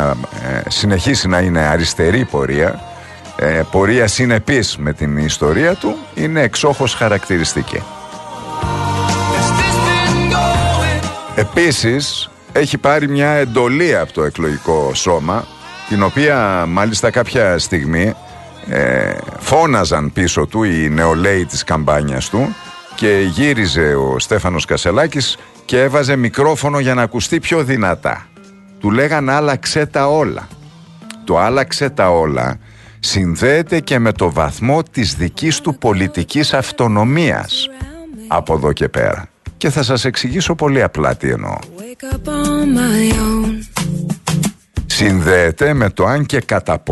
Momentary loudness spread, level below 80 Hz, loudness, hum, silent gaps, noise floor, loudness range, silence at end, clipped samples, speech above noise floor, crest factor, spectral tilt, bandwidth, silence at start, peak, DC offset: 8 LU; -32 dBFS; -15 LUFS; none; none; -40 dBFS; 2 LU; 0 s; under 0.1%; 26 dB; 14 dB; -5 dB/octave; 12.5 kHz; 0 s; 0 dBFS; under 0.1%